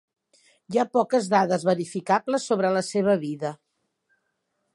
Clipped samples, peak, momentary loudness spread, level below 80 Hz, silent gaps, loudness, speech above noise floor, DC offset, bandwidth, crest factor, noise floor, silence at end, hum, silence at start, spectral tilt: under 0.1%; -6 dBFS; 7 LU; -72 dBFS; none; -24 LUFS; 53 dB; under 0.1%; 11.5 kHz; 20 dB; -76 dBFS; 1.2 s; none; 0.7 s; -5.5 dB/octave